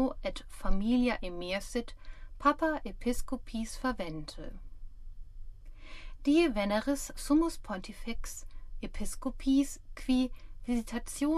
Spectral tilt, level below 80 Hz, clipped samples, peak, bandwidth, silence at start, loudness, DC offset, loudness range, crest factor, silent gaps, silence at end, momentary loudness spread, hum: -4.5 dB/octave; -40 dBFS; under 0.1%; -14 dBFS; 14.5 kHz; 0 s; -33 LUFS; under 0.1%; 5 LU; 20 dB; none; 0 s; 19 LU; none